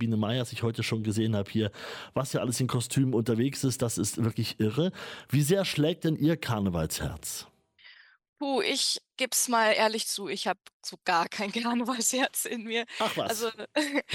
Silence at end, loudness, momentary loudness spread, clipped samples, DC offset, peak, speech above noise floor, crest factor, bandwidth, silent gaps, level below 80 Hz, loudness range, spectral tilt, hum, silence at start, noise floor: 0 s; -28 LUFS; 8 LU; under 0.1%; under 0.1%; -12 dBFS; 27 dB; 16 dB; 17.5 kHz; 8.29-8.33 s, 10.73-10.80 s; -58 dBFS; 2 LU; -4 dB/octave; none; 0 s; -56 dBFS